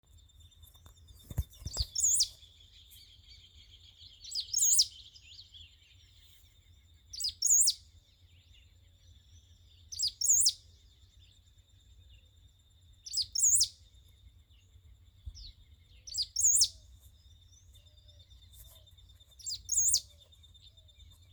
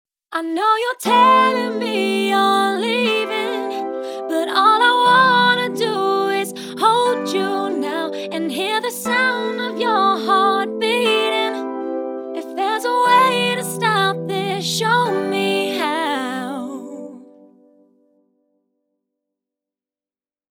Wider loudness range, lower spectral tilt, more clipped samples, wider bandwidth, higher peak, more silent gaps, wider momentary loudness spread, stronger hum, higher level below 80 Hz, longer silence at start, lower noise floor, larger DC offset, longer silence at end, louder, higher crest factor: second, 3 LU vs 6 LU; second, 1 dB/octave vs -3.5 dB/octave; neither; about the same, over 20 kHz vs 18.5 kHz; second, -14 dBFS vs -2 dBFS; neither; first, 27 LU vs 13 LU; neither; first, -56 dBFS vs -80 dBFS; first, 1.3 s vs 0.3 s; second, -62 dBFS vs under -90 dBFS; neither; second, 1.3 s vs 3.3 s; second, -28 LUFS vs -18 LUFS; first, 22 dB vs 16 dB